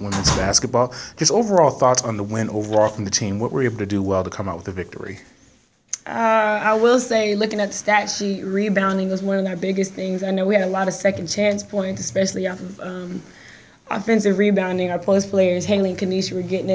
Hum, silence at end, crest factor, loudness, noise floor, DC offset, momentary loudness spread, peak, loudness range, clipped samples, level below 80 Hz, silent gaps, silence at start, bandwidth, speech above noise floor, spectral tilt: none; 0 s; 20 dB; -20 LUFS; -55 dBFS; under 0.1%; 12 LU; -2 dBFS; 4 LU; under 0.1%; -44 dBFS; none; 0 s; 8 kHz; 35 dB; -4.5 dB/octave